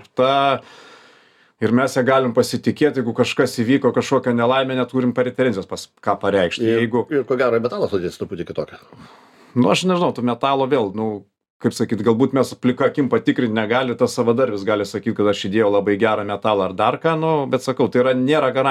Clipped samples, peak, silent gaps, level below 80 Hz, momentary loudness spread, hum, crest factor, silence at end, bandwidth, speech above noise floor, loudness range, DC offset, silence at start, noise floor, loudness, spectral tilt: under 0.1%; -2 dBFS; 11.50-11.60 s; -62 dBFS; 8 LU; none; 18 dB; 0 s; 14 kHz; 35 dB; 3 LU; under 0.1%; 0.15 s; -53 dBFS; -19 LUFS; -6 dB/octave